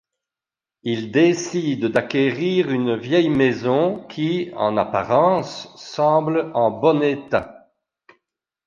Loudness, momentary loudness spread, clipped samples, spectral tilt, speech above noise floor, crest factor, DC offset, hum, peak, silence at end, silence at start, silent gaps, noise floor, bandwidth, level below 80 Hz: -20 LUFS; 8 LU; under 0.1%; -6 dB/octave; 70 dB; 18 dB; under 0.1%; none; -2 dBFS; 1.15 s; 0.85 s; none; -89 dBFS; 7.4 kHz; -58 dBFS